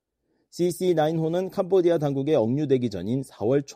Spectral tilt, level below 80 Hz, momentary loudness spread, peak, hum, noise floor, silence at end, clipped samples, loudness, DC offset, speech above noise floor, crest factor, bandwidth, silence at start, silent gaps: -7 dB/octave; -64 dBFS; 6 LU; -10 dBFS; none; -73 dBFS; 0 s; under 0.1%; -24 LUFS; under 0.1%; 49 dB; 14 dB; 15 kHz; 0.55 s; none